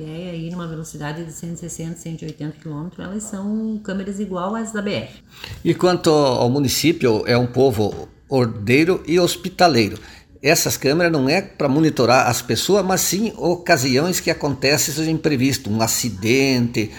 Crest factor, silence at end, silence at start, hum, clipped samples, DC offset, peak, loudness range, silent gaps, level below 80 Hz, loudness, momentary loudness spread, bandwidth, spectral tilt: 20 dB; 0 s; 0 s; none; under 0.1%; under 0.1%; 0 dBFS; 10 LU; none; -48 dBFS; -19 LUFS; 14 LU; 17.5 kHz; -4.5 dB/octave